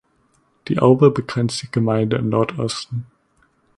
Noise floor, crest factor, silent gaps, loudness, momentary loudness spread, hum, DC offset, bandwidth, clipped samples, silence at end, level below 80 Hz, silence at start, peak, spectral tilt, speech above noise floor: -62 dBFS; 20 dB; none; -19 LUFS; 14 LU; none; under 0.1%; 11.5 kHz; under 0.1%; 0.75 s; -54 dBFS; 0.65 s; 0 dBFS; -6.5 dB/octave; 44 dB